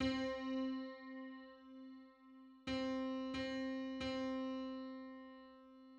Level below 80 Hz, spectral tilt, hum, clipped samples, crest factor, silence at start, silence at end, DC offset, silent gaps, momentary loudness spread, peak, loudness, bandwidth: -68 dBFS; -5.5 dB/octave; none; under 0.1%; 18 dB; 0 s; 0 s; under 0.1%; none; 18 LU; -28 dBFS; -44 LUFS; 8.6 kHz